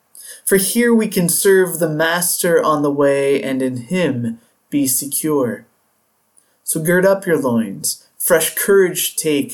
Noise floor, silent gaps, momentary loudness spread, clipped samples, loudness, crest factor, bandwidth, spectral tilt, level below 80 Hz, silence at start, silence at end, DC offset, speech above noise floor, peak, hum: -63 dBFS; none; 9 LU; under 0.1%; -16 LUFS; 14 dB; 19 kHz; -4 dB/octave; -58 dBFS; 0.15 s; 0 s; under 0.1%; 47 dB; -2 dBFS; none